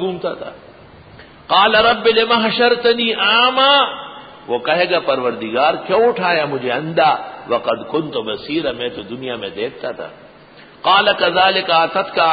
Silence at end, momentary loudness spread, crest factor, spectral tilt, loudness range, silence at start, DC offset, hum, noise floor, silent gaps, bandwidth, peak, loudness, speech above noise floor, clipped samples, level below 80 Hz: 0 s; 14 LU; 16 dB; -9 dB/octave; 7 LU; 0 s; under 0.1%; none; -42 dBFS; none; 5 kHz; -2 dBFS; -15 LUFS; 27 dB; under 0.1%; -54 dBFS